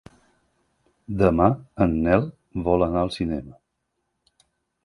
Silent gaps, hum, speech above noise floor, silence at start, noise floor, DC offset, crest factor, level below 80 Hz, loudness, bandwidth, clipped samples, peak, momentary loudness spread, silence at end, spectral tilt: none; none; 55 dB; 1.1 s; -77 dBFS; under 0.1%; 22 dB; -40 dBFS; -23 LUFS; 11 kHz; under 0.1%; -2 dBFS; 12 LU; 1.35 s; -8.5 dB/octave